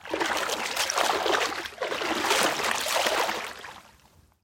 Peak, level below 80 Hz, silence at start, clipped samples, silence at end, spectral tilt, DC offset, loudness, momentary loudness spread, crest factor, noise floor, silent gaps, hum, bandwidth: -8 dBFS; -62 dBFS; 0.05 s; under 0.1%; 0.6 s; -0.5 dB/octave; under 0.1%; -26 LUFS; 10 LU; 20 dB; -59 dBFS; none; none; 16.5 kHz